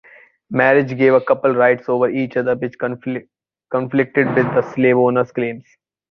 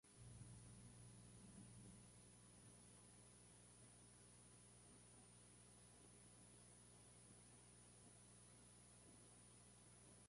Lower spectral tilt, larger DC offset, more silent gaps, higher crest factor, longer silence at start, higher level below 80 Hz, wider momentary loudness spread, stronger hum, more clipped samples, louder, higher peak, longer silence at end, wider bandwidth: first, -9 dB/octave vs -4 dB/octave; neither; neither; about the same, 16 dB vs 16 dB; first, 0.5 s vs 0.05 s; first, -60 dBFS vs -78 dBFS; first, 10 LU vs 3 LU; second, none vs 60 Hz at -70 dBFS; neither; first, -17 LUFS vs -65 LUFS; first, -2 dBFS vs -50 dBFS; first, 0.5 s vs 0 s; second, 6.2 kHz vs 11.5 kHz